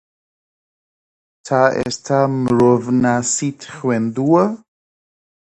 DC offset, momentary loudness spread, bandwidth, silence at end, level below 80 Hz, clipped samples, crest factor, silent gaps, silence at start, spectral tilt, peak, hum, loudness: under 0.1%; 8 LU; 9 kHz; 1 s; -54 dBFS; under 0.1%; 18 dB; none; 1.45 s; -5.5 dB/octave; 0 dBFS; none; -17 LUFS